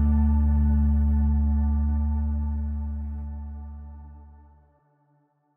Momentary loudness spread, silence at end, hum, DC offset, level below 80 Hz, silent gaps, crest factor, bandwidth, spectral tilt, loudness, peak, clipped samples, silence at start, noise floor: 18 LU; 1.25 s; none; under 0.1%; -26 dBFS; none; 12 dB; 1.9 kHz; -12.5 dB/octave; -25 LUFS; -14 dBFS; under 0.1%; 0 s; -67 dBFS